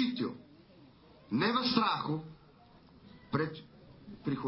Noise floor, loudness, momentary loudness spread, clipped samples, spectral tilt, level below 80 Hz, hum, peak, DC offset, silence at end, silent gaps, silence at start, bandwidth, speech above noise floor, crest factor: -59 dBFS; -33 LUFS; 23 LU; under 0.1%; -9 dB/octave; -68 dBFS; none; -12 dBFS; under 0.1%; 0 s; none; 0 s; 5.8 kHz; 28 dB; 24 dB